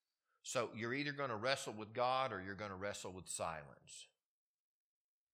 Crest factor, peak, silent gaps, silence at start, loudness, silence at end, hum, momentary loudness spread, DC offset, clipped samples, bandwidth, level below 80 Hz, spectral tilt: 26 dB; -18 dBFS; none; 0.45 s; -42 LUFS; 1.3 s; none; 17 LU; under 0.1%; under 0.1%; 15.5 kHz; -80 dBFS; -3.5 dB/octave